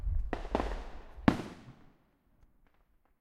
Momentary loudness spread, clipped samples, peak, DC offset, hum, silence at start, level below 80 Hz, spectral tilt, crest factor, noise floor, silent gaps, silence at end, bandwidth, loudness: 18 LU; under 0.1%; -4 dBFS; under 0.1%; none; 0 s; -42 dBFS; -7 dB/octave; 32 dB; -69 dBFS; none; 1.5 s; 12.5 kHz; -35 LUFS